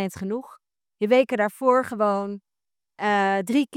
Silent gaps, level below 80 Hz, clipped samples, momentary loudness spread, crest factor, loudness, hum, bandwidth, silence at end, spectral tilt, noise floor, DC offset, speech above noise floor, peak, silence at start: none; -70 dBFS; under 0.1%; 11 LU; 18 dB; -23 LUFS; none; 15.5 kHz; 0 s; -5.5 dB/octave; under -90 dBFS; under 0.1%; over 67 dB; -6 dBFS; 0 s